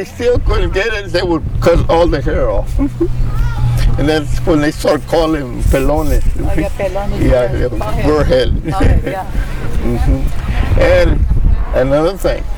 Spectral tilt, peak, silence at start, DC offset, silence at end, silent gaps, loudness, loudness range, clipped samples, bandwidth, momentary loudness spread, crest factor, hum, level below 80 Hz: -7 dB/octave; -2 dBFS; 0 s; under 0.1%; 0 s; none; -15 LUFS; 1 LU; under 0.1%; 18 kHz; 6 LU; 10 dB; none; -16 dBFS